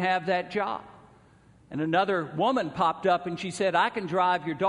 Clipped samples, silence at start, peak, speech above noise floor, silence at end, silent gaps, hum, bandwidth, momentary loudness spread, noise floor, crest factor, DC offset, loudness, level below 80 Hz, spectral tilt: under 0.1%; 0 s; -10 dBFS; 31 dB; 0 s; none; none; 10.5 kHz; 8 LU; -57 dBFS; 18 dB; under 0.1%; -27 LUFS; -66 dBFS; -5.5 dB/octave